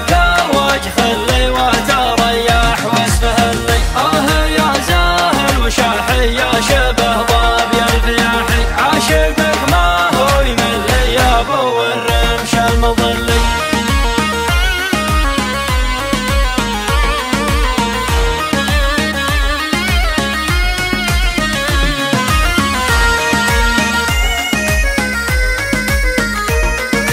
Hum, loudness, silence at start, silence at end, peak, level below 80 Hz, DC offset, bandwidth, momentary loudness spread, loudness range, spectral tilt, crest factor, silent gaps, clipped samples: none; -13 LUFS; 0 s; 0 s; 0 dBFS; -18 dBFS; under 0.1%; 16 kHz; 3 LU; 2 LU; -4 dB/octave; 12 dB; none; under 0.1%